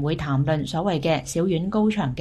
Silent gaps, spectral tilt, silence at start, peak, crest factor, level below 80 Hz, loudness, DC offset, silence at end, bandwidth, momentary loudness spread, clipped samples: none; -6.5 dB/octave; 0 s; -10 dBFS; 14 dB; -46 dBFS; -23 LUFS; under 0.1%; 0 s; 13 kHz; 2 LU; under 0.1%